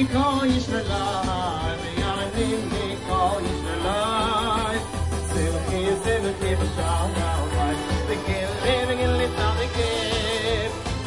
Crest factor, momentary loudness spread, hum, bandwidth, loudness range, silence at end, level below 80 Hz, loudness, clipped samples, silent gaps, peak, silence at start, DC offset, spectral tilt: 16 dB; 4 LU; none; 11.5 kHz; 1 LU; 0 s; -34 dBFS; -24 LUFS; under 0.1%; none; -8 dBFS; 0 s; under 0.1%; -5 dB/octave